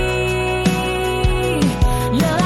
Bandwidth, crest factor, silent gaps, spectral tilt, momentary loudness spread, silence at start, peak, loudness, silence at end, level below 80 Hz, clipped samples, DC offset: 16 kHz; 14 dB; none; -5.5 dB/octave; 1 LU; 0 s; -4 dBFS; -18 LUFS; 0 s; -24 dBFS; under 0.1%; under 0.1%